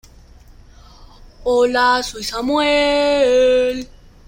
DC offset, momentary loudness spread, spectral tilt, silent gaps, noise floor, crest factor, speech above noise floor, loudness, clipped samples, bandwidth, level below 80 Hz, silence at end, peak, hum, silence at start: under 0.1%; 11 LU; -3 dB/octave; none; -44 dBFS; 14 dB; 28 dB; -16 LUFS; under 0.1%; 16.5 kHz; -42 dBFS; 0.45 s; -4 dBFS; none; 1 s